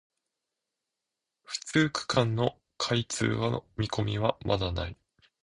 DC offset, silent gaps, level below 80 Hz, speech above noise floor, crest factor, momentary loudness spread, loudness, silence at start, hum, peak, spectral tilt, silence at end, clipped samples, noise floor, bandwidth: under 0.1%; none; -50 dBFS; 58 dB; 22 dB; 8 LU; -30 LUFS; 1.5 s; none; -10 dBFS; -5 dB/octave; 0.5 s; under 0.1%; -87 dBFS; 11 kHz